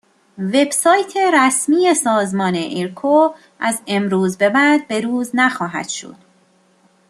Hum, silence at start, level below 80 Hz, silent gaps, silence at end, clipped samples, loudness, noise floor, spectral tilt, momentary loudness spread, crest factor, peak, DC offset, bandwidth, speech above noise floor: none; 0.4 s; -66 dBFS; none; 1 s; under 0.1%; -16 LUFS; -56 dBFS; -4 dB/octave; 9 LU; 16 dB; -2 dBFS; under 0.1%; 13 kHz; 39 dB